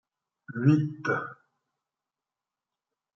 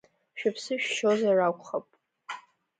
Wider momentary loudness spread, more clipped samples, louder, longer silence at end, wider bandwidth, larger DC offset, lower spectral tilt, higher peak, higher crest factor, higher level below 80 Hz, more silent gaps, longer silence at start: about the same, 17 LU vs 18 LU; neither; about the same, -27 LUFS vs -28 LUFS; first, 1.85 s vs 0.4 s; second, 6.8 kHz vs 9.4 kHz; neither; first, -9 dB/octave vs -4 dB/octave; first, -8 dBFS vs -14 dBFS; first, 22 dB vs 16 dB; about the same, -76 dBFS vs -80 dBFS; neither; first, 0.5 s vs 0.35 s